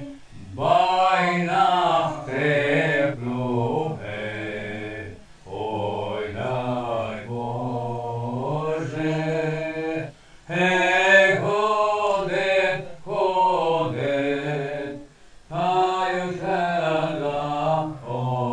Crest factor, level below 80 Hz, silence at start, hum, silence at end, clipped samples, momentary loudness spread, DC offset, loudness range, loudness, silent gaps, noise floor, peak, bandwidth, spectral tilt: 20 dB; -54 dBFS; 0 s; none; 0 s; under 0.1%; 12 LU; under 0.1%; 8 LU; -23 LUFS; none; -46 dBFS; -4 dBFS; 10.5 kHz; -5.5 dB/octave